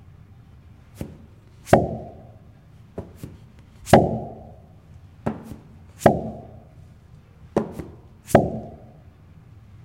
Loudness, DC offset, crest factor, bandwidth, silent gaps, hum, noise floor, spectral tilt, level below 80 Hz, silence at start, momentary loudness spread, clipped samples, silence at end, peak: -22 LUFS; under 0.1%; 24 dB; 16 kHz; none; none; -48 dBFS; -6.5 dB/octave; -46 dBFS; 1 s; 26 LU; under 0.1%; 1.1 s; -2 dBFS